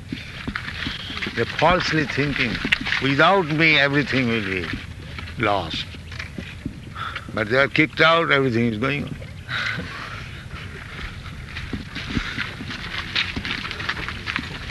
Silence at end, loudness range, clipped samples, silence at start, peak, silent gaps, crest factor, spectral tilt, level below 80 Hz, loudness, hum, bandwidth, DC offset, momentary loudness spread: 0 s; 11 LU; under 0.1%; 0 s; -2 dBFS; none; 22 dB; -5.5 dB/octave; -42 dBFS; -22 LUFS; none; 12 kHz; under 0.1%; 17 LU